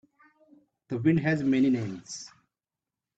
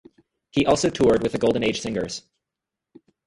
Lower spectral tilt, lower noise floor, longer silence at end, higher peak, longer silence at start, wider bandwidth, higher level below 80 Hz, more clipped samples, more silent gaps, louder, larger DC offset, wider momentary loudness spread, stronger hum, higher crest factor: first, -6.5 dB/octave vs -5 dB/octave; first, under -90 dBFS vs -86 dBFS; second, 0.9 s vs 1.05 s; second, -12 dBFS vs -4 dBFS; first, 0.9 s vs 0.55 s; second, 8.2 kHz vs 11.5 kHz; second, -66 dBFS vs -50 dBFS; neither; neither; second, -26 LUFS vs -22 LUFS; neither; first, 16 LU vs 10 LU; neither; about the same, 18 dB vs 20 dB